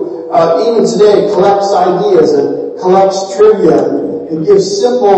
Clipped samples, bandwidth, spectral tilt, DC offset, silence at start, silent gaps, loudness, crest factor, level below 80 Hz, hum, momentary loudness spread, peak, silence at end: 0.3%; 8.6 kHz; -5.5 dB/octave; under 0.1%; 0 s; none; -9 LUFS; 8 dB; -52 dBFS; none; 7 LU; 0 dBFS; 0 s